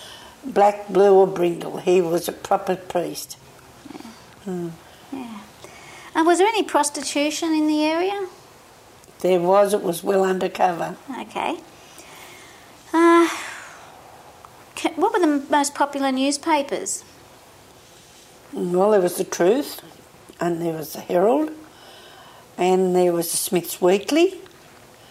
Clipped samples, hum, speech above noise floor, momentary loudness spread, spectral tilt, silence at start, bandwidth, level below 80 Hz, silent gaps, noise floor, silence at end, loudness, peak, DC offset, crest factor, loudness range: under 0.1%; none; 28 dB; 22 LU; -4.5 dB/octave; 0 s; 16 kHz; -64 dBFS; none; -48 dBFS; 0.65 s; -21 LUFS; -6 dBFS; under 0.1%; 16 dB; 4 LU